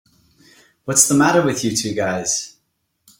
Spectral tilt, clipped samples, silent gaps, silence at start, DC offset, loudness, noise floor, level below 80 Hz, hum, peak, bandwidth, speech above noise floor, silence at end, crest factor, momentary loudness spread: -3 dB/octave; under 0.1%; none; 0.85 s; under 0.1%; -17 LUFS; -70 dBFS; -56 dBFS; none; 0 dBFS; 16.5 kHz; 53 dB; 0.7 s; 20 dB; 12 LU